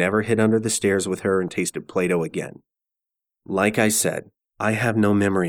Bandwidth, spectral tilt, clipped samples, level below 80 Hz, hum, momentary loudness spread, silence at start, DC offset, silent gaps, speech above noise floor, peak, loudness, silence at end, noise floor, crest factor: 18.5 kHz; -4.5 dB/octave; under 0.1%; -58 dBFS; none; 9 LU; 0 s; under 0.1%; none; 66 dB; -4 dBFS; -21 LUFS; 0 s; -87 dBFS; 18 dB